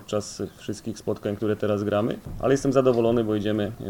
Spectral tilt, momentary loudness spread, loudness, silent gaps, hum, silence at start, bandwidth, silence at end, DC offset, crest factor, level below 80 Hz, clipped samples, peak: -6.5 dB/octave; 13 LU; -25 LUFS; none; none; 0 s; 18 kHz; 0 s; under 0.1%; 18 dB; -48 dBFS; under 0.1%; -6 dBFS